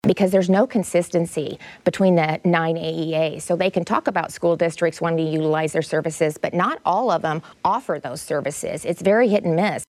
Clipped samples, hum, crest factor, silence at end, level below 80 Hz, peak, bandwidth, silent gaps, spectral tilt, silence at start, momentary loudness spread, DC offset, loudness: under 0.1%; none; 16 dB; 0.05 s; -60 dBFS; -4 dBFS; 14 kHz; none; -6 dB/octave; 0.05 s; 8 LU; under 0.1%; -21 LUFS